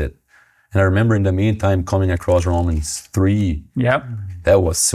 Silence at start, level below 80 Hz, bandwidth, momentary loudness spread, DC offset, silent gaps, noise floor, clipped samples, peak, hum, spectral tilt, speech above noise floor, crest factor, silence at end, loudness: 0 s; -28 dBFS; 15.5 kHz; 8 LU; under 0.1%; none; -54 dBFS; under 0.1%; -2 dBFS; none; -5.5 dB/octave; 37 dB; 16 dB; 0 s; -18 LUFS